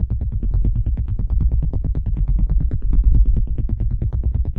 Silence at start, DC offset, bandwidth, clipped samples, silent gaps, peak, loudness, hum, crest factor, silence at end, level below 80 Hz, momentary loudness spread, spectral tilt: 0 s; under 0.1%; 1.4 kHz; under 0.1%; none; -4 dBFS; -22 LUFS; none; 14 dB; 0 s; -18 dBFS; 5 LU; -12.5 dB/octave